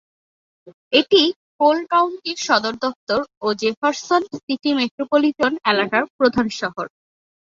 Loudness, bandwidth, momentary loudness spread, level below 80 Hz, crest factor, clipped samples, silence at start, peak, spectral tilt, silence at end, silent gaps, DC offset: -19 LUFS; 7.6 kHz; 9 LU; -58 dBFS; 18 dB; under 0.1%; 0.65 s; -2 dBFS; -3.5 dB/octave; 0.7 s; 0.74-0.91 s, 1.36-1.59 s, 2.96-3.07 s, 3.37-3.41 s, 3.77-3.82 s, 4.43-4.48 s, 4.91-4.98 s, 6.10-6.19 s; under 0.1%